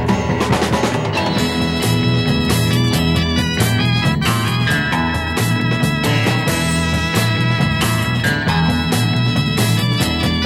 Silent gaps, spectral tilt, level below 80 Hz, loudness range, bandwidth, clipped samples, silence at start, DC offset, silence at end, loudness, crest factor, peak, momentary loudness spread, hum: none; -5 dB/octave; -32 dBFS; 1 LU; 16 kHz; under 0.1%; 0 s; under 0.1%; 0 s; -16 LUFS; 14 dB; -2 dBFS; 2 LU; none